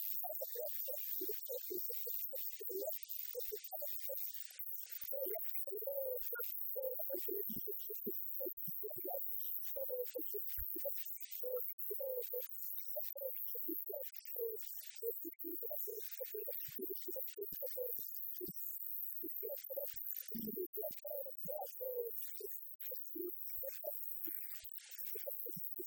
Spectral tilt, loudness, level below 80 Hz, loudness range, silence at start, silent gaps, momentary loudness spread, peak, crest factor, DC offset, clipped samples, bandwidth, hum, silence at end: -3.5 dB/octave; -41 LUFS; -74 dBFS; 3 LU; 0 s; 8.53-8.57 s, 11.73-11.78 s, 20.66-20.73 s, 22.75-22.79 s; 4 LU; -24 dBFS; 20 dB; under 0.1%; under 0.1%; over 20 kHz; none; 0 s